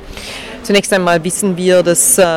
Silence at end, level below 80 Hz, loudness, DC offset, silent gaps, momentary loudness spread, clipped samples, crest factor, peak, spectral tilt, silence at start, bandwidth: 0 s; -40 dBFS; -12 LUFS; under 0.1%; none; 17 LU; under 0.1%; 12 dB; 0 dBFS; -3 dB/octave; 0 s; 17 kHz